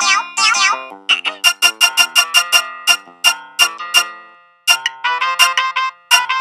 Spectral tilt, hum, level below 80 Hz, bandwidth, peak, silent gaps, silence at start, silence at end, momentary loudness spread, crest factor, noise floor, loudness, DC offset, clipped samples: 3.5 dB/octave; none; -74 dBFS; over 20 kHz; 0 dBFS; none; 0 s; 0 s; 7 LU; 16 dB; -43 dBFS; -13 LUFS; under 0.1%; under 0.1%